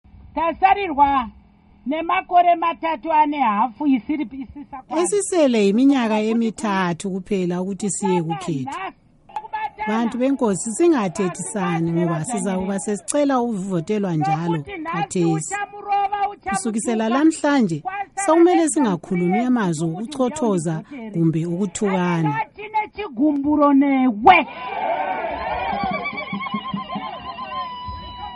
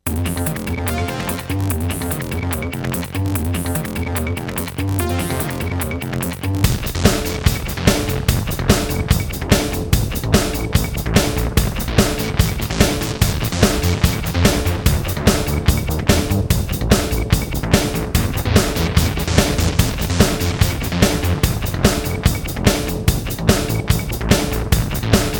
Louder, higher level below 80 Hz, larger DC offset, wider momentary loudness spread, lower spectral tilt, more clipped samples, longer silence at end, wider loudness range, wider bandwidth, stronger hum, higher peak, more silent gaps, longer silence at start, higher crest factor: about the same, -20 LUFS vs -19 LUFS; second, -52 dBFS vs -24 dBFS; neither; first, 13 LU vs 6 LU; about the same, -5.5 dB/octave vs -5 dB/octave; neither; about the same, 0 s vs 0 s; about the same, 5 LU vs 4 LU; second, 11.5 kHz vs over 20 kHz; neither; about the same, 0 dBFS vs 0 dBFS; neither; first, 0.2 s vs 0.05 s; about the same, 20 dB vs 18 dB